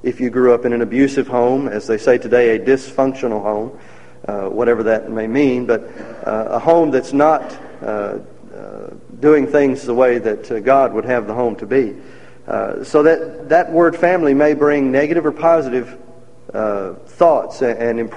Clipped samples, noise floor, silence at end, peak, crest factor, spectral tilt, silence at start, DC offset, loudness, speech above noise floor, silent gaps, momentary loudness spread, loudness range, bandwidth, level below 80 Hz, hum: under 0.1%; -40 dBFS; 0 s; 0 dBFS; 16 dB; -7 dB/octave; 0.05 s; 1%; -16 LUFS; 24 dB; none; 13 LU; 3 LU; 10 kHz; -52 dBFS; none